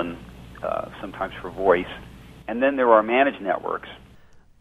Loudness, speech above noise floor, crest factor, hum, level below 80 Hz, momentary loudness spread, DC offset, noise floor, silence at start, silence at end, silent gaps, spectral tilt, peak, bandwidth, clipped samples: -23 LUFS; 27 dB; 22 dB; none; -50 dBFS; 23 LU; under 0.1%; -50 dBFS; 0 s; 0.65 s; none; -6.5 dB/octave; -2 dBFS; 12.5 kHz; under 0.1%